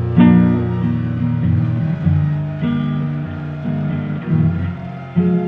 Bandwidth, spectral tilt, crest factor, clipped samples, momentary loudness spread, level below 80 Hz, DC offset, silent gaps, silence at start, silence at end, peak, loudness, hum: 4.2 kHz; -11 dB/octave; 16 dB; under 0.1%; 11 LU; -42 dBFS; under 0.1%; none; 0 s; 0 s; 0 dBFS; -18 LUFS; none